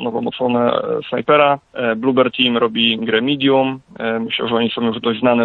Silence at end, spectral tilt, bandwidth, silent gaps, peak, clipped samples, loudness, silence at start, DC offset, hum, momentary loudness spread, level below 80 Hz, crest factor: 0 s; -8 dB/octave; 4.3 kHz; none; -2 dBFS; under 0.1%; -17 LUFS; 0 s; under 0.1%; none; 7 LU; -60 dBFS; 16 dB